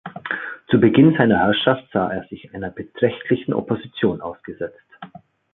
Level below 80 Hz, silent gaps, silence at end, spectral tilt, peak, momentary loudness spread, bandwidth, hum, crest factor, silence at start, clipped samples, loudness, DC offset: -52 dBFS; none; 0.5 s; -11 dB/octave; -2 dBFS; 18 LU; 4.1 kHz; none; 20 dB; 0.05 s; under 0.1%; -19 LUFS; under 0.1%